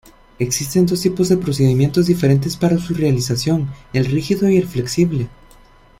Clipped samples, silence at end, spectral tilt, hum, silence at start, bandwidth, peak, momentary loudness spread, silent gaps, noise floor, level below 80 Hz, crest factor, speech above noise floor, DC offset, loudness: under 0.1%; 0.7 s; -6 dB/octave; none; 0.4 s; 16.5 kHz; -2 dBFS; 6 LU; none; -47 dBFS; -42 dBFS; 14 dB; 30 dB; under 0.1%; -17 LUFS